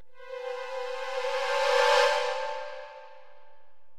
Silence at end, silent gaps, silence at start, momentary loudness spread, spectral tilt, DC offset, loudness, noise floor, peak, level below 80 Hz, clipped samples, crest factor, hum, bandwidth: 0 s; none; 0 s; 21 LU; 1 dB/octave; under 0.1%; -27 LUFS; -62 dBFS; -10 dBFS; -72 dBFS; under 0.1%; 18 dB; none; 15.5 kHz